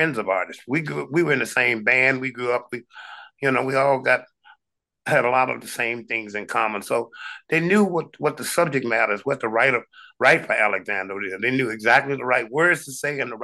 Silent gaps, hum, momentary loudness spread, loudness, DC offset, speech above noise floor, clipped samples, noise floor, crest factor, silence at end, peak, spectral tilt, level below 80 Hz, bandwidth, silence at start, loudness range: none; none; 9 LU; -21 LUFS; under 0.1%; 56 dB; under 0.1%; -78 dBFS; 20 dB; 0 s; -2 dBFS; -4.5 dB/octave; -72 dBFS; 12.5 kHz; 0 s; 3 LU